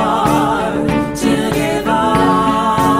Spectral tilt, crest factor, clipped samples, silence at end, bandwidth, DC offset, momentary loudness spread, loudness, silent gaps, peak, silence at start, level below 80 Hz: -5.5 dB/octave; 14 dB; under 0.1%; 0 s; 16 kHz; under 0.1%; 4 LU; -14 LUFS; none; 0 dBFS; 0 s; -34 dBFS